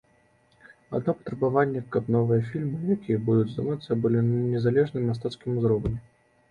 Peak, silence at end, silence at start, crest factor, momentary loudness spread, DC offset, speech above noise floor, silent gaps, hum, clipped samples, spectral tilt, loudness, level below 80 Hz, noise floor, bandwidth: -10 dBFS; 0.5 s; 0.9 s; 16 dB; 7 LU; under 0.1%; 38 dB; none; none; under 0.1%; -9.5 dB/octave; -26 LUFS; -52 dBFS; -63 dBFS; 8.6 kHz